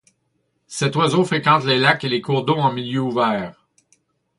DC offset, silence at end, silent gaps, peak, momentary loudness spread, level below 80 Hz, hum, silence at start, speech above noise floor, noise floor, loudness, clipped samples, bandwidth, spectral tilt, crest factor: under 0.1%; 0.85 s; none; 0 dBFS; 8 LU; -60 dBFS; none; 0.7 s; 51 dB; -69 dBFS; -19 LUFS; under 0.1%; 11.5 kHz; -5 dB/octave; 20 dB